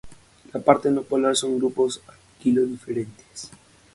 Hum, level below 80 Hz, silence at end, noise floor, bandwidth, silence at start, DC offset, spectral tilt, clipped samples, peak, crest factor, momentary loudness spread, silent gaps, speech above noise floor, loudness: none; -60 dBFS; 0.45 s; -44 dBFS; 11.5 kHz; 0.05 s; under 0.1%; -4.5 dB/octave; under 0.1%; 0 dBFS; 24 dB; 19 LU; none; 22 dB; -23 LUFS